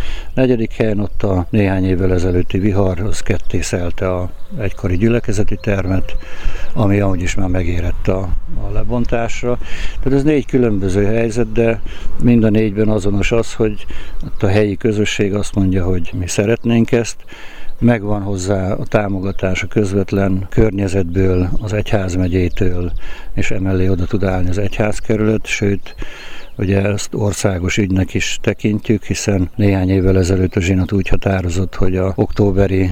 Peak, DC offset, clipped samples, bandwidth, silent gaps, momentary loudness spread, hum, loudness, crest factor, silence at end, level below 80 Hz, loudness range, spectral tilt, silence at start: -2 dBFS; under 0.1%; under 0.1%; 10.5 kHz; none; 10 LU; none; -17 LUFS; 12 dB; 0 s; -24 dBFS; 3 LU; -6.5 dB/octave; 0 s